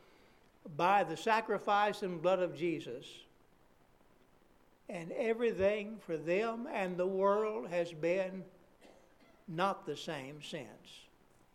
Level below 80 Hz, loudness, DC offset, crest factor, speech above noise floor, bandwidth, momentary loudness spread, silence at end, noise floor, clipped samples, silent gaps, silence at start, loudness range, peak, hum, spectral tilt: -72 dBFS; -35 LUFS; under 0.1%; 22 dB; 31 dB; 14.5 kHz; 17 LU; 0.5 s; -66 dBFS; under 0.1%; none; 0.65 s; 6 LU; -16 dBFS; none; -5.5 dB/octave